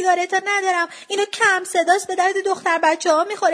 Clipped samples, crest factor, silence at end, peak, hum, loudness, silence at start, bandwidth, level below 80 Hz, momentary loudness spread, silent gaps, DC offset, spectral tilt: under 0.1%; 16 dB; 0 s; -2 dBFS; none; -19 LUFS; 0 s; 11 kHz; -76 dBFS; 5 LU; none; under 0.1%; -1 dB/octave